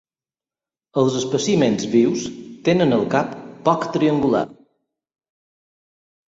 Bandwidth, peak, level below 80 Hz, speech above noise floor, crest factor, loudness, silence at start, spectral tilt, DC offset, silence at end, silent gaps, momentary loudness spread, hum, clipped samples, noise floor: 8 kHz; -2 dBFS; -58 dBFS; over 72 dB; 20 dB; -19 LUFS; 0.95 s; -5.5 dB/octave; under 0.1%; 1.75 s; none; 9 LU; none; under 0.1%; under -90 dBFS